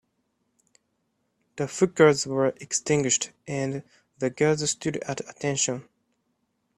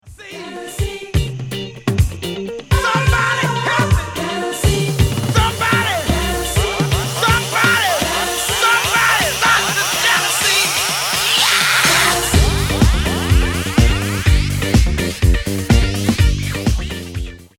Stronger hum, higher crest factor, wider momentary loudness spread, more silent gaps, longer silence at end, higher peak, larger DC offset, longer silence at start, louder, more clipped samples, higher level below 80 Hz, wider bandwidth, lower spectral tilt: neither; first, 24 dB vs 16 dB; about the same, 13 LU vs 11 LU; neither; first, 0.95 s vs 0.15 s; second, -4 dBFS vs 0 dBFS; neither; first, 1.55 s vs 0.05 s; second, -25 LUFS vs -15 LUFS; neither; second, -66 dBFS vs -22 dBFS; second, 12 kHz vs 19 kHz; about the same, -4 dB/octave vs -3.5 dB/octave